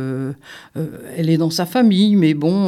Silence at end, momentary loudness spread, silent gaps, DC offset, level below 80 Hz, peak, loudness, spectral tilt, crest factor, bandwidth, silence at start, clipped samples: 0 s; 15 LU; none; under 0.1%; -64 dBFS; -4 dBFS; -16 LUFS; -6.5 dB/octave; 14 dB; 15.5 kHz; 0 s; under 0.1%